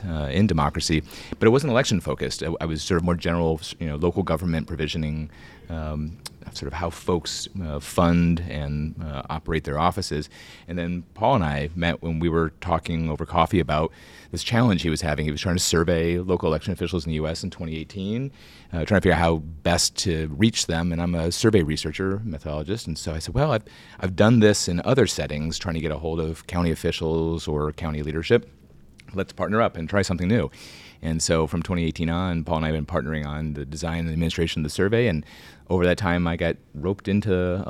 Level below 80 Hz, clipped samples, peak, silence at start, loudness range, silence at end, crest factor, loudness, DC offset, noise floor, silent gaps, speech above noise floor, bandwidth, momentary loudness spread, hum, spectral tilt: -38 dBFS; under 0.1%; -4 dBFS; 0 s; 4 LU; 0 s; 20 dB; -24 LUFS; under 0.1%; -49 dBFS; none; 26 dB; 15 kHz; 11 LU; none; -5.5 dB/octave